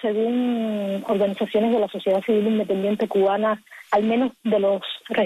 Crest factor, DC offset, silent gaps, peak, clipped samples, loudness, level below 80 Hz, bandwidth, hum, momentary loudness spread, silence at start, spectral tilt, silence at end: 14 dB; under 0.1%; none; -8 dBFS; under 0.1%; -22 LUFS; -66 dBFS; 13.5 kHz; none; 5 LU; 0 s; -7 dB/octave; 0 s